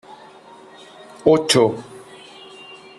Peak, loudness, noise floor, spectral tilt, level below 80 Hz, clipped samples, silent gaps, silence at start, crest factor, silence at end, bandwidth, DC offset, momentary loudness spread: -2 dBFS; -17 LUFS; -44 dBFS; -4 dB/octave; -60 dBFS; under 0.1%; none; 0.1 s; 20 dB; 0.25 s; 13 kHz; under 0.1%; 26 LU